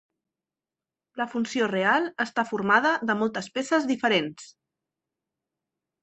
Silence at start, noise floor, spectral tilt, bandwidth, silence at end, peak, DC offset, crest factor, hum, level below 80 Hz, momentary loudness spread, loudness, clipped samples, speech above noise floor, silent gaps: 1.15 s; under -90 dBFS; -4.5 dB/octave; 8.4 kHz; 1.55 s; -6 dBFS; under 0.1%; 22 dB; none; -72 dBFS; 10 LU; -25 LUFS; under 0.1%; over 65 dB; none